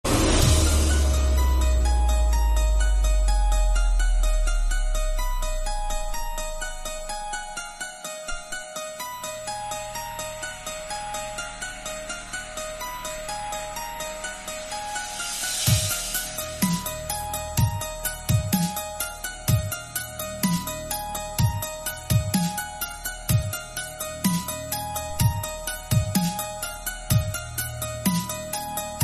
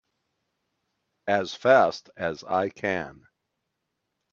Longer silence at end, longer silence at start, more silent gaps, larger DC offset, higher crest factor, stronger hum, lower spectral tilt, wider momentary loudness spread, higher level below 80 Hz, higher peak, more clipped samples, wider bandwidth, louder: second, 0 s vs 1.2 s; second, 0.05 s vs 1.25 s; neither; neither; second, 18 dB vs 24 dB; neither; about the same, -4 dB/octave vs -5 dB/octave; second, 10 LU vs 13 LU; first, -28 dBFS vs -68 dBFS; second, -8 dBFS vs -4 dBFS; neither; first, 13.5 kHz vs 7.4 kHz; about the same, -26 LUFS vs -25 LUFS